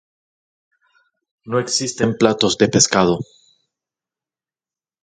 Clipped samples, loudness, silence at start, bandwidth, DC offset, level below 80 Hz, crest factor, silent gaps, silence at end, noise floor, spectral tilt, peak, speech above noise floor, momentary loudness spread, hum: under 0.1%; -17 LUFS; 1.45 s; 10 kHz; under 0.1%; -54 dBFS; 20 dB; none; 1.8 s; under -90 dBFS; -3.5 dB/octave; 0 dBFS; over 73 dB; 10 LU; none